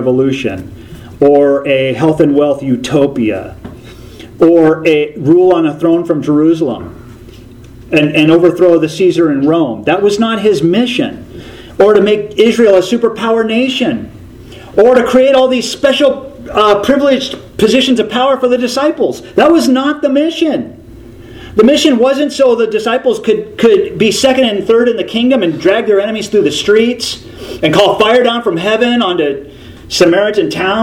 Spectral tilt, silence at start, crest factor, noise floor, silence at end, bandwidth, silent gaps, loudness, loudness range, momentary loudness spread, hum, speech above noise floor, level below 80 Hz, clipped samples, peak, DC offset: -5 dB/octave; 0 s; 10 dB; -33 dBFS; 0 s; 16 kHz; none; -10 LUFS; 2 LU; 9 LU; none; 23 dB; -42 dBFS; 0.3%; 0 dBFS; under 0.1%